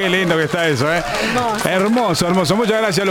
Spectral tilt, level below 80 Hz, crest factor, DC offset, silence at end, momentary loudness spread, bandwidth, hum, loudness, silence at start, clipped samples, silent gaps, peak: -4.5 dB/octave; -44 dBFS; 14 dB; under 0.1%; 0 s; 2 LU; 17 kHz; none; -16 LUFS; 0 s; under 0.1%; none; -2 dBFS